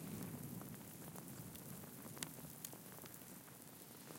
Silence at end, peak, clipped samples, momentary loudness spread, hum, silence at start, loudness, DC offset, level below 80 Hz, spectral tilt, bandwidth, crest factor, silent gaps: 0 s; -24 dBFS; under 0.1%; 6 LU; none; 0 s; -52 LUFS; under 0.1%; -76 dBFS; -4 dB/octave; 17 kHz; 30 dB; none